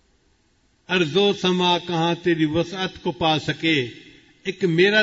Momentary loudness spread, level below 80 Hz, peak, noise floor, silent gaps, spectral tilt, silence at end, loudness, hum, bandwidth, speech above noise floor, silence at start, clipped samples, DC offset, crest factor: 8 LU; -56 dBFS; -6 dBFS; -63 dBFS; none; -5.5 dB/octave; 0 s; -21 LUFS; none; 8 kHz; 42 dB; 0.9 s; under 0.1%; under 0.1%; 16 dB